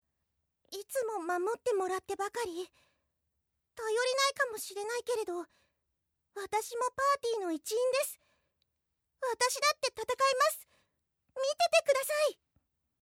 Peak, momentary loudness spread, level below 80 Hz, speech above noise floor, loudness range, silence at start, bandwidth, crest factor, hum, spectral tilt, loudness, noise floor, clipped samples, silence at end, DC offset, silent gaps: -12 dBFS; 15 LU; -78 dBFS; 50 dB; 5 LU; 0.7 s; 17 kHz; 22 dB; none; -0.5 dB/octave; -32 LUFS; -82 dBFS; under 0.1%; 0.7 s; under 0.1%; none